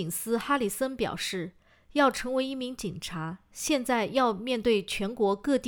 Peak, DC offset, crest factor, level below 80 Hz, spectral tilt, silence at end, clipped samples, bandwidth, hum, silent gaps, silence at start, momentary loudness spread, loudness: -10 dBFS; under 0.1%; 18 dB; -56 dBFS; -4 dB/octave; 0 s; under 0.1%; over 20 kHz; none; none; 0 s; 10 LU; -29 LUFS